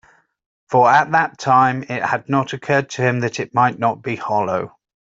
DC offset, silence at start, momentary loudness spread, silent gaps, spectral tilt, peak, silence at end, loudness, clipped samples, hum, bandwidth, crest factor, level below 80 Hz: under 0.1%; 0.7 s; 9 LU; none; -6 dB/octave; -2 dBFS; 0.5 s; -18 LUFS; under 0.1%; none; 7.8 kHz; 16 dB; -62 dBFS